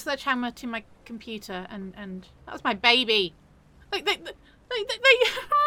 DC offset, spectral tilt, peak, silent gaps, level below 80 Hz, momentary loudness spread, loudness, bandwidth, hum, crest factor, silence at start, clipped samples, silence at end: under 0.1%; -3 dB/octave; -4 dBFS; none; -58 dBFS; 21 LU; -24 LUFS; 17 kHz; none; 24 dB; 0 s; under 0.1%; 0 s